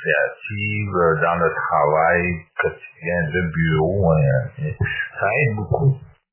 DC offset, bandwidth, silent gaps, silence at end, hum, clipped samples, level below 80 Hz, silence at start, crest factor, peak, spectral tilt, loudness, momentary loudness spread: under 0.1%; 3.2 kHz; none; 0.25 s; none; under 0.1%; -40 dBFS; 0 s; 16 dB; -4 dBFS; -11 dB/octave; -20 LUFS; 8 LU